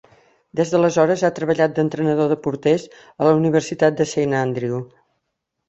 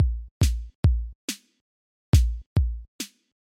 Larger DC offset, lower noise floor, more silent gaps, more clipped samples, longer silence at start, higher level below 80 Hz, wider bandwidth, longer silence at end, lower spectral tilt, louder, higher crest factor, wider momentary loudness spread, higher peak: neither; second, -77 dBFS vs under -90 dBFS; second, none vs 0.31-0.40 s, 0.75-0.83 s, 1.15-1.28 s, 1.61-2.13 s, 2.46-2.56 s, 2.88-2.99 s; neither; first, 0.55 s vs 0 s; second, -60 dBFS vs -28 dBFS; second, 8.2 kHz vs 16 kHz; first, 0.8 s vs 0.35 s; about the same, -6.5 dB/octave vs -5.5 dB/octave; first, -19 LUFS vs -26 LUFS; about the same, 18 dB vs 18 dB; second, 7 LU vs 15 LU; first, -2 dBFS vs -6 dBFS